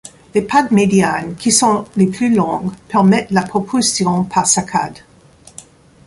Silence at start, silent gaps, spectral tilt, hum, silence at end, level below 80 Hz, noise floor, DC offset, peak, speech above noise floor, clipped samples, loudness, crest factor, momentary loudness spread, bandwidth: 0.05 s; none; -4.5 dB/octave; none; 0.45 s; -50 dBFS; -41 dBFS; under 0.1%; 0 dBFS; 26 dB; under 0.1%; -15 LUFS; 16 dB; 8 LU; 11.5 kHz